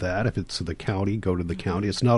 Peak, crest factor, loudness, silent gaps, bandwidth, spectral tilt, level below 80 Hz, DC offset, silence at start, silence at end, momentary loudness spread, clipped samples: -8 dBFS; 16 dB; -27 LUFS; none; 11.5 kHz; -6.5 dB/octave; -40 dBFS; under 0.1%; 0 s; 0 s; 4 LU; under 0.1%